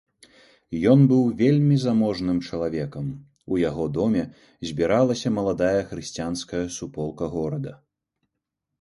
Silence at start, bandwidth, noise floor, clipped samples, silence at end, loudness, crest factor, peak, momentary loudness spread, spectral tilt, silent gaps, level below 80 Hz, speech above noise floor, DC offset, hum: 0.7 s; 11.5 kHz; -82 dBFS; under 0.1%; 1.05 s; -23 LUFS; 20 dB; -4 dBFS; 14 LU; -7 dB/octave; none; -50 dBFS; 60 dB; under 0.1%; none